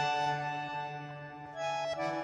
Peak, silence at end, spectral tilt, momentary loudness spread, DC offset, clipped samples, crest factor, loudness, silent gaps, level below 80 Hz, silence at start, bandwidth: -20 dBFS; 0 s; -4.5 dB/octave; 12 LU; under 0.1%; under 0.1%; 14 dB; -36 LUFS; none; -72 dBFS; 0 s; 10.5 kHz